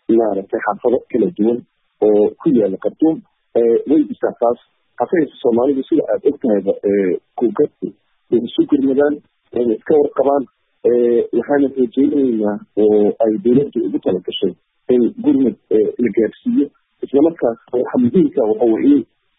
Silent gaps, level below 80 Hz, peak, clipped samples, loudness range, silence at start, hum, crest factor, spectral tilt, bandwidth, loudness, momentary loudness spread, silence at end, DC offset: none; -58 dBFS; -2 dBFS; under 0.1%; 2 LU; 0.1 s; none; 14 dB; -12 dB/octave; 3.9 kHz; -16 LUFS; 7 LU; 0.35 s; under 0.1%